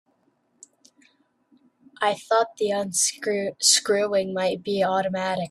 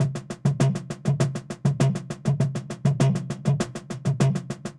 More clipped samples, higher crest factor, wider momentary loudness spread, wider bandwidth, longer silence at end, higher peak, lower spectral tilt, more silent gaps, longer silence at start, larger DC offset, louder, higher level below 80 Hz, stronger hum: neither; about the same, 20 dB vs 16 dB; about the same, 8 LU vs 6 LU; first, 14 kHz vs 11.5 kHz; about the same, 0 s vs 0.05 s; first, -4 dBFS vs -8 dBFS; second, -2 dB/octave vs -7 dB/octave; neither; first, 2 s vs 0 s; neither; about the same, -23 LUFS vs -25 LUFS; second, -70 dBFS vs -54 dBFS; neither